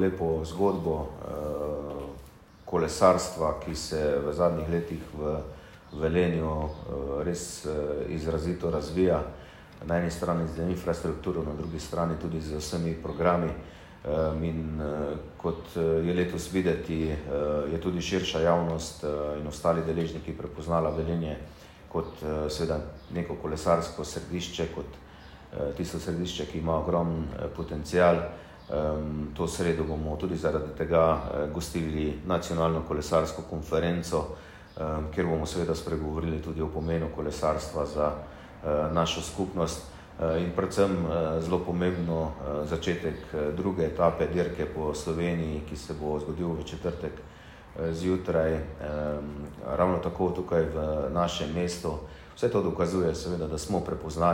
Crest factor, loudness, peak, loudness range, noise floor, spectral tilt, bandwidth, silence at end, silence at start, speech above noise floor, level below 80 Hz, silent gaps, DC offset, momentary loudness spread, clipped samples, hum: 22 dB; -30 LUFS; -6 dBFS; 4 LU; -50 dBFS; -6 dB/octave; 16 kHz; 0 s; 0 s; 21 dB; -46 dBFS; none; under 0.1%; 10 LU; under 0.1%; none